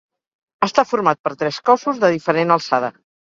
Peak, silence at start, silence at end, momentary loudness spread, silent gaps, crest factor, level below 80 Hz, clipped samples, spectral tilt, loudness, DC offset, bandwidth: 0 dBFS; 0.6 s; 0.35 s; 6 LU; 1.19-1.24 s; 18 dB; -64 dBFS; under 0.1%; -5 dB/octave; -18 LUFS; under 0.1%; 7.6 kHz